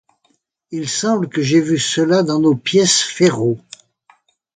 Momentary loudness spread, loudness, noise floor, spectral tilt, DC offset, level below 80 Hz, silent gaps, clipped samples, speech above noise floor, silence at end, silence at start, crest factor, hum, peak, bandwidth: 9 LU; -16 LUFS; -64 dBFS; -4 dB/octave; under 0.1%; -60 dBFS; none; under 0.1%; 48 dB; 1 s; 0.7 s; 16 dB; none; 0 dBFS; 9.6 kHz